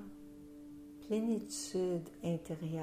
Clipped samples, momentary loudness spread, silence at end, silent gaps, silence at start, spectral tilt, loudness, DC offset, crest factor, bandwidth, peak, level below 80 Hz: under 0.1%; 17 LU; 0 s; none; 0 s; -6 dB/octave; -38 LUFS; under 0.1%; 14 dB; 15.5 kHz; -26 dBFS; -68 dBFS